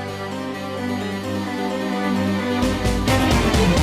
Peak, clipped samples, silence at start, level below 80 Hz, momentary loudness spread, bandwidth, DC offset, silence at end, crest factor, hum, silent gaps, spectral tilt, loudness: -10 dBFS; under 0.1%; 0 s; -30 dBFS; 10 LU; 15.5 kHz; under 0.1%; 0 s; 10 dB; none; none; -5.5 dB/octave; -21 LUFS